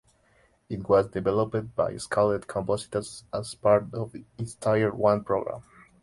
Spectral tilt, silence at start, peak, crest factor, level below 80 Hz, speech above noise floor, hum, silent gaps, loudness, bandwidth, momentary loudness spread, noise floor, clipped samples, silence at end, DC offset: -6 dB/octave; 0.7 s; -8 dBFS; 18 dB; -56 dBFS; 37 dB; none; none; -27 LUFS; 11.5 kHz; 14 LU; -64 dBFS; under 0.1%; 0.4 s; under 0.1%